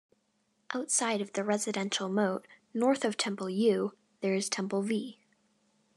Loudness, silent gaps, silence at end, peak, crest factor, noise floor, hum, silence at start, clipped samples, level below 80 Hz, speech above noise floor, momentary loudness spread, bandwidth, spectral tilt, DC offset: -31 LUFS; none; 0.85 s; -14 dBFS; 18 dB; -75 dBFS; none; 0.7 s; under 0.1%; -90 dBFS; 44 dB; 9 LU; 12.5 kHz; -3.5 dB/octave; under 0.1%